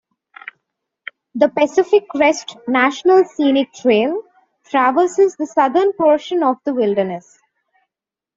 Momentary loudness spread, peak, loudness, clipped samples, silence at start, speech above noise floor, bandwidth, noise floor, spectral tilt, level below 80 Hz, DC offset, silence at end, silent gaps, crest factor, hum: 19 LU; 0 dBFS; -16 LUFS; under 0.1%; 1.35 s; 71 dB; 7.8 kHz; -87 dBFS; -4.5 dB/octave; -64 dBFS; under 0.1%; 1.15 s; none; 16 dB; none